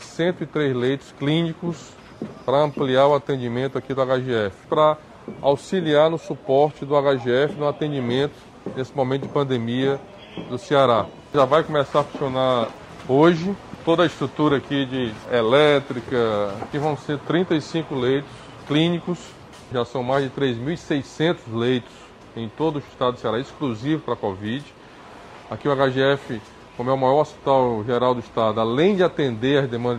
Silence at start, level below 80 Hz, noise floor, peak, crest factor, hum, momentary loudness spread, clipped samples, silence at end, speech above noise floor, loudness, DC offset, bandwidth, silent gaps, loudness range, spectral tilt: 0 s; -56 dBFS; -43 dBFS; -4 dBFS; 18 dB; none; 12 LU; under 0.1%; 0 s; 22 dB; -22 LUFS; under 0.1%; 10.5 kHz; none; 5 LU; -6.5 dB/octave